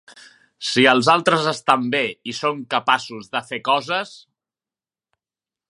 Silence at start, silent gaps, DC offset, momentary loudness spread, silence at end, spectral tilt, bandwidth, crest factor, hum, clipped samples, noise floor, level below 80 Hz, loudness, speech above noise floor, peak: 0.15 s; none; under 0.1%; 12 LU; 1.55 s; -4 dB/octave; 11.5 kHz; 22 dB; none; under 0.1%; under -90 dBFS; -70 dBFS; -19 LUFS; over 70 dB; 0 dBFS